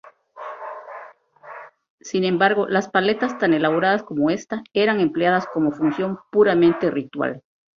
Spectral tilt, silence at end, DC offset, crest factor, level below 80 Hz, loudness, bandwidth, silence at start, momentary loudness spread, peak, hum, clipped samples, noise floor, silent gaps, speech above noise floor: -6 dB/octave; 0.35 s; under 0.1%; 18 dB; -62 dBFS; -20 LUFS; 7.4 kHz; 0.35 s; 21 LU; -2 dBFS; none; under 0.1%; -44 dBFS; 1.90-1.98 s; 24 dB